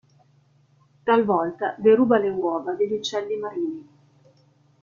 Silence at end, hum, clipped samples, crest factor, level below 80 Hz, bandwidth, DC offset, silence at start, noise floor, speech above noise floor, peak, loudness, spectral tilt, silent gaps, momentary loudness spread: 1 s; none; under 0.1%; 18 dB; -68 dBFS; 7.2 kHz; under 0.1%; 1.05 s; -60 dBFS; 38 dB; -6 dBFS; -23 LUFS; -5.5 dB/octave; none; 12 LU